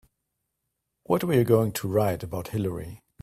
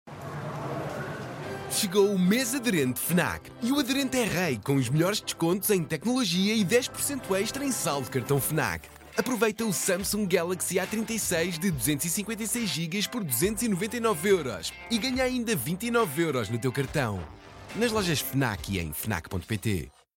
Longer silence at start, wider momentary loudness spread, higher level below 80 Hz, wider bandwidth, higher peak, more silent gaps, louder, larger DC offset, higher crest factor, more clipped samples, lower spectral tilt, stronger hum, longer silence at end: first, 1.1 s vs 0.05 s; about the same, 11 LU vs 9 LU; about the same, -56 dBFS vs -54 dBFS; about the same, 16 kHz vs 17 kHz; about the same, -6 dBFS vs -8 dBFS; neither; about the same, -25 LUFS vs -27 LUFS; neither; about the same, 20 dB vs 18 dB; neither; first, -7 dB/octave vs -4 dB/octave; neither; about the same, 0.25 s vs 0.3 s